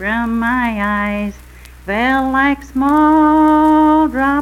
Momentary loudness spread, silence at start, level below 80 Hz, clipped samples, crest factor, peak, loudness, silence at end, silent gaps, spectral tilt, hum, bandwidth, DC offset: 10 LU; 0 s; -36 dBFS; under 0.1%; 12 dB; -2 dBFS; -13 LUFS; 0 s; none; -6.5 dB/octave; none; 13.5 kHz; under 0.1%